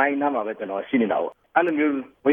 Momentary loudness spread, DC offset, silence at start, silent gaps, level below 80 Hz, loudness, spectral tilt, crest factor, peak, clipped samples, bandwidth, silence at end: 6 LU; under 0.1%; 0 s; none; -70 dBFS; -24 LUFS; -8.5 dB/octave; 18 dB; -6 dBFS; under 0.1%; 3.7 kHz; 0 s